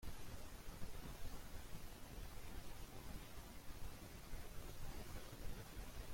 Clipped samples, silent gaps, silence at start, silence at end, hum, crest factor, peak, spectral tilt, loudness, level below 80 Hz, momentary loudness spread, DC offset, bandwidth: under 0.1%; none; 0 s; 0 s; none; 16 dB; -34 dBFS; -4.5 dB/octave; -56 LUFS; -54 dBFS; 2 LU; under 0.1%; 16.5 kHz